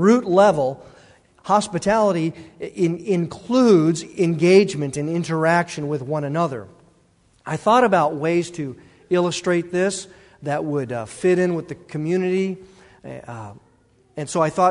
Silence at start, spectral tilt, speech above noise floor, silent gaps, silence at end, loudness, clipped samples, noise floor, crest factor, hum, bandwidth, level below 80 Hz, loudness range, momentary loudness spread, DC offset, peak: 0 s; -6 dB/octave; 39 dB; none; 0 s; -20 LUFS; under 0.1%; -58 dBFS; 18 dB; none; 11 kHz; -58 dBFS; 5 LU; 19 LU; under 0.1%; -2 dBFS